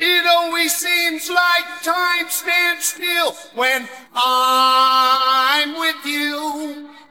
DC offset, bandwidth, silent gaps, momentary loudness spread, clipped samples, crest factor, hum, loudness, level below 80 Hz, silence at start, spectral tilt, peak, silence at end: 0.1%; 17.5 kHz; none; 9 LU; under 0.1%; 16 dB; none; -16 LUFS; -74 dBFS; 0 s; 1 dB/octave; -2 dBFS; 0.2 s